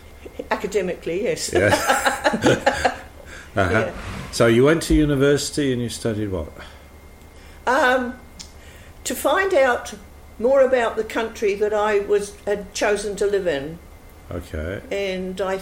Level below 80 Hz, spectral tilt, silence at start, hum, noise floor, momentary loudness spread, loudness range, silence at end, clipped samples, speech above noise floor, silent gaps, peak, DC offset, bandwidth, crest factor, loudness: -40 dBFS; -4.5 dB/octave; 0.05 s; none; -44 dBFS; 18 LU; 5 LU; 0 s; under 0.1%; 23 dB; none; -4 dBFS; under 0.1%; 16.5 kHz; 16 dB; -21 LUFS